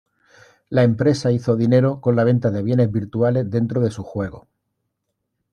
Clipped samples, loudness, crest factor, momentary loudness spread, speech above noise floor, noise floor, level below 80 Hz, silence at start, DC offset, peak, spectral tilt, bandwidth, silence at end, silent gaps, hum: under 0.1%; -19 LUFS; 16 dB; 8 LU; 58 dB; -76 dBFS; -56 dBFS; 0.7 s; under 0.1%; -4 dBFS; -8.5 dB/octave; 9.8 kHz; 1.15 s; none; none